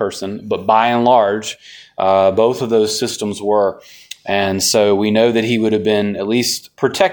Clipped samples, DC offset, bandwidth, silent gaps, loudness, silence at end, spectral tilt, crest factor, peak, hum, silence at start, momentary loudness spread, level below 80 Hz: under 0.1%; under 0.1%; 19.5 kHz; none; -15 LUFS; 0 s; -4 dB/octave; 16 dB; 0 dBFS; none; 0 s; 10 LU; -58 dBFS